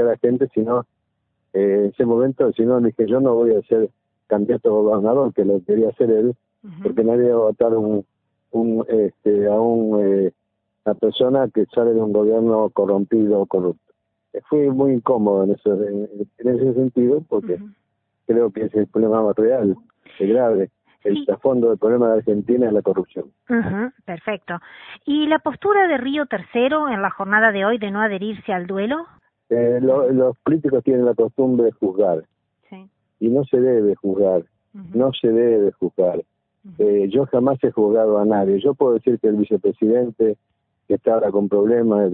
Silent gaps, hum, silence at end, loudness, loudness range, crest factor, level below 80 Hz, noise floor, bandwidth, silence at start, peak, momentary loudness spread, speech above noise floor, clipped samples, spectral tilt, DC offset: none; none; 0 s; -19 LUFS; 3 LU; 16 dB; -60 dBFS; -72 dBFS; 3.9 kHz; 0 s; -2 dBFS; 9 LU; 54 dB; under 0.1%; -12 dB/octave; under 0.1%